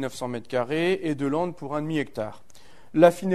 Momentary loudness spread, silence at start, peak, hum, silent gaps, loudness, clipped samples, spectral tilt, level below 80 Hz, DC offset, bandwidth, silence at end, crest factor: 13 LU; 0 s; -2 dBFS; none; none; -26 LUFS; under 0.1%; -6.5 dB/octave; -60 dBFS; 0.7%; 13.5 kHz; 0 s; 22 dB